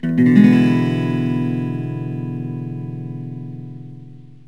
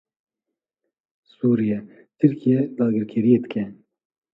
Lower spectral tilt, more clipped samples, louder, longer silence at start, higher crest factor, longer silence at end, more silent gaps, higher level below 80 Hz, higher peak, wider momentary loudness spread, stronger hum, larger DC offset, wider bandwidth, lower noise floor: second, -9 dB/octave vs -11 dB/octave; neither; first, -18 LUFS vs -21 LUFS; second, 0.05 s vs 1.45 s; about the same, 18 dB vs 20 dB; second, 0.3 s vs 0.6 s; neither; first, -58 dBFS vs -66 dBFS; first, 0 dBFS vs -4 dBFS; first, 21 LU vs 10 LU; neither; first, 0.6% vs under 0.1%; first, 7 kHz vs 4.2 kHz; second, -40 dBFS vs -85 dBFS